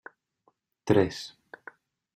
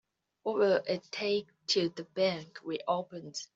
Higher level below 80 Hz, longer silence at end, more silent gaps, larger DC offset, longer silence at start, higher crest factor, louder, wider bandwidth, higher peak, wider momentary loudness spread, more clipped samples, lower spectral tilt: first, -62 dBFS vs -78 dBFS; first, 0.9 s vs 0.1 s; neither; neither; first, 0.85 s vs 0.45 s; first, 24 dB vs 18 dB; first, -27 LUFS vs -32 LUFS; first, 13 kHz vs 8 kHz; first, -8 dBFS vs -16 dBFS; first, 23 LU vs 12 LU; neither; first, -6.5 dB/octave vs -4 dB/octave